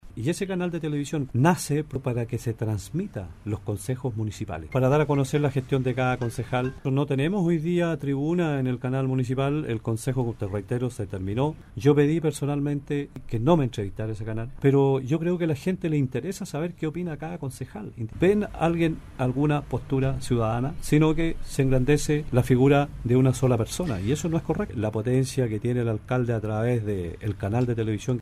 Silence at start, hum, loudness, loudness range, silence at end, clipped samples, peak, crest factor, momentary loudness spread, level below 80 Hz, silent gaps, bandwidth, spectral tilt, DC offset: 0.05 s; none; -26 LUFS; 4 LU; 0 s; under 0.1%; -6 dBFS; 18 dB; 10 LU; -42 dBFS; none; 14.5 kHz; -7 dB/octave; under 0.1%